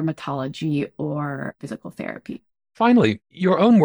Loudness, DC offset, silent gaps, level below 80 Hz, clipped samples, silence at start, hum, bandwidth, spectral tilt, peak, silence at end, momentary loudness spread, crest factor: -22 LUFS; under 0.1%; none; -62 dBFS; under 0.1%; 0 s; none; over 20 kHz; -8 dB/octave; -4 dBFS; 0 s; 18 LU; 18 dB